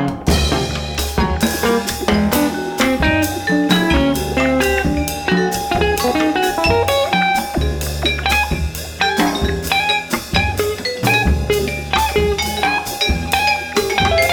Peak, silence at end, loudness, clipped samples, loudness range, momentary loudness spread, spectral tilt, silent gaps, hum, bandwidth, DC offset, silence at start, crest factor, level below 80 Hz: 0 dBFS; 0 s; -17 LUFS; under 0.1%; 1 LU; 5 LU; -4.5 dB/octave; none; none; over 20 kHz; under 0.1%; 0 s; 16 dB; -26 dBFS